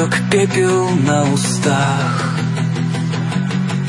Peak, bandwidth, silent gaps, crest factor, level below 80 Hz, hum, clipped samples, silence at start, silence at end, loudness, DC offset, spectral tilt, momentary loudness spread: -2 dBFS; 11.5 kHz; none; 14 dB; -54 dBFS; none; under 0.1%; 0 s; 0 s; -16 LUFS; under 0.1%; -5.5 dB/octave; 5 LU